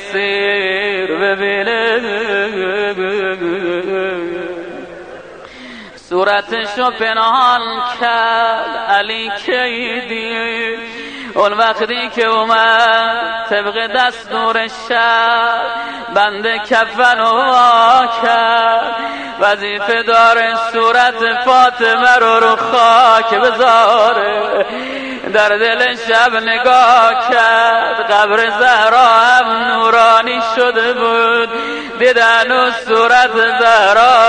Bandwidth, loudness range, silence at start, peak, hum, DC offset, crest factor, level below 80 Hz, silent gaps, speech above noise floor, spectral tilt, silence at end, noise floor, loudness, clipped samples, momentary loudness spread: 9.6 kHz; 7 LU; 0 s; 0 dBFS; none; under 0.1%; 12 dB; -54 dBFS; none; 21 dB; -2.5 dB/octave; 0 s; -33 dBFS; -12 LUFS; under 0.1%; 11 LU